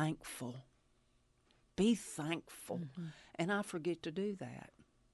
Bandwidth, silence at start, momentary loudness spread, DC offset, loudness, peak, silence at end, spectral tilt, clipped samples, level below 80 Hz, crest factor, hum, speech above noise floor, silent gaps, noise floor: 12 kHz; 0 s; 16 LU; under 0.1%; -40 LUFS; -22 dBFS; 0.3 s; -5.5 dB/octave; under 0.1%; -72 dBFS; 20 dB; none; 34 dB; none; -74 dBFS